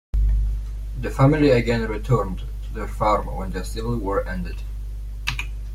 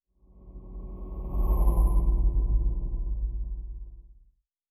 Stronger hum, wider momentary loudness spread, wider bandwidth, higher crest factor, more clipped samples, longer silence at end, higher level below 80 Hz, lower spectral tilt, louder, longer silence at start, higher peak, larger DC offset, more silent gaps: first, 50 Hz at -30 dBFS vs none; second, 15 LU vs 20 LU; about the same, 14 kHz vs 13.5 kHz; about the same, 18 dB vs 14 dB; neither; second, 0 s vs 0.6 s; about the same, -26 dBFS vs -28 dBFS; second, -7 dB/octave vs -10.5 dB/octave; first, -23 LUFS vs -30 LUFS; second, 0.15 s vs 0.4 s; first, -6 dBFS vs -12 dBFS; neither; neither